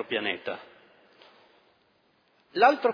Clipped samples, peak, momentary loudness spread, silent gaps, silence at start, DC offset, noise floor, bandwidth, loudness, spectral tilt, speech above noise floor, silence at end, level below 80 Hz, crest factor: under 0.1%; -6 dBFS; 16 LU; none; 0 s; under 0.1%; -67 dBFS; 5.4 kHz; -26 LUFS; -5 dB/octave; 42 dB; 0 s; -84 dBFS; 22 dB